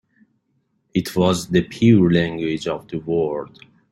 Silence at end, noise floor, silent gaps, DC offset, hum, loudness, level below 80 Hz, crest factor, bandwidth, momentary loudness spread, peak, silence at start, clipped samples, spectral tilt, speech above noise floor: 0.45 s; -68 dBFS; none; under 0.1%; none; -20 LUFS; -52 dBFS; 18 dB; 14 kHz; 12 LU; -2 dBFS; 0.95 s; under 0.1%; -6.5 dB/octave; 49 dB